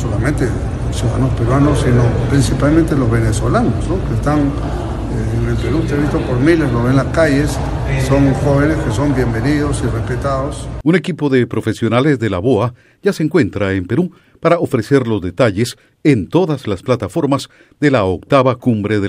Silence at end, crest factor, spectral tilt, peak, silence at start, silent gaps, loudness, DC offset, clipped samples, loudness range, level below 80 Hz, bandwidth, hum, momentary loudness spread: 0 s; 14 dB; -7 dB/octave; 0 dBFS; 0 s; none; -15 LUFS; under 0.1%; under 0.1%; 2 LU; -26 dBFS; 12.5 kHz; none; 7 LU